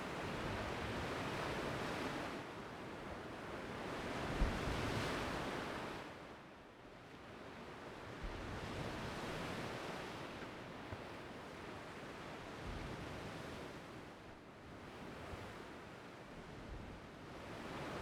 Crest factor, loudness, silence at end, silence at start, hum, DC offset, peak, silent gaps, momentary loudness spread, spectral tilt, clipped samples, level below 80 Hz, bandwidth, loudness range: 22 dB; -46 LUFS; 0 s; 0 s; none; under 0.1%; -24 dBFS; none; 13 LU; -5 dB/octave; under 0.1%; -56 dBFS; 19.5 kHz; 8 LU